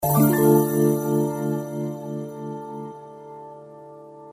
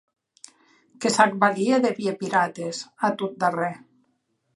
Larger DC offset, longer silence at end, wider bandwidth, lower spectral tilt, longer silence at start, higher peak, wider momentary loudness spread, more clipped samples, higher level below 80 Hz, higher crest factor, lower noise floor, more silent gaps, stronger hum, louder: neither; second, 0 s vs 0.8 s; first, 15.5 kHz vs 11.5 kHz; first, -7 dB/octave vs -4.5 dB/octave; second, 0 s vs 1 s; about the same, -4 dBFS vs -2 dBFS; first, 25 LU vs 11 LU; neither; first, -58 dBFS vs -76 dBFS; about the same, 18 dB vs 22 dB; second, -43 dBFS vs -72 dBFS; neither; neither; about the same, -22 LUFS vs -23 LUFS